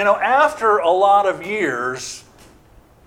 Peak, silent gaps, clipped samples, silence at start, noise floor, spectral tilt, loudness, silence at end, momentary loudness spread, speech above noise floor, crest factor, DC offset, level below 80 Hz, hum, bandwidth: -2 dBFS; none; under 0.1%; 0 s; -49 dBFS; -3.5 dB/octave; -17 LUFS; 0.85 s; 14 LU; 32 dB; 16 dB; under 0.1%; -56 dBFS; none; 15.5 kHz